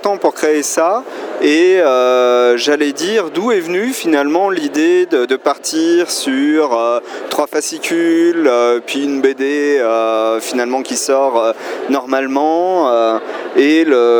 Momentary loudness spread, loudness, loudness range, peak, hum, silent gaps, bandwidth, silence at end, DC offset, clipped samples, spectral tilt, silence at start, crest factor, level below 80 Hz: 6 LU; -14 LUFS; 2 LU; 0 dBFS; none; none; over 20 kHz; 0 s; under 0.1%; under 0.1%; -2.5 dB/octave; 0 s; 14 dB; -76 dBFS